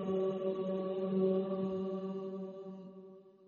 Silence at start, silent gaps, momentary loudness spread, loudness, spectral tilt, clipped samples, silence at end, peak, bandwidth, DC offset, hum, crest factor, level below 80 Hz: 0 s; none; 18 LU; -36 LUFS; -8.5 dB/octave; under 0.1%; 0.15 s; -20 dBFS; 6.8 kHz; under 0.1%; none; 16 dB; -78 dBFS